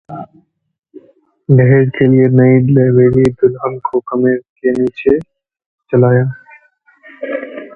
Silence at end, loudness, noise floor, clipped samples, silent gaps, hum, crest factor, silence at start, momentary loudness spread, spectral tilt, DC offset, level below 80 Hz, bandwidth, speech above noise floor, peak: 0.1 s; -12 LUFS; -49 dBFS; under 0.1%; 4.49-4.56 s, 5.66-5.78 s; none; 12 dB; 0.1 s; 14 LU; -10.5 dB/octave; under 0.1%; -46 dBFS; 4.1 kHz; 39 dB; 0 dBFS